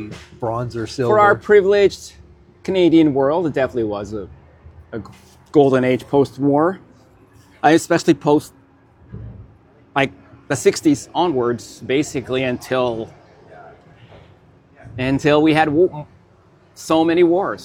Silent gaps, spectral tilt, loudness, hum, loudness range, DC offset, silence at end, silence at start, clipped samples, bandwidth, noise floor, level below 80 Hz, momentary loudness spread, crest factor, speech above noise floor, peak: none; -6 dB/octave; -17 LUFS; none; 6 LU; under 0.1%; 0 s; 0 s; under 0.1%; 16 kHz; -51 dBFS; -50 dBFS; 20 LU; 18 dB; 35 dB; 0 dBFS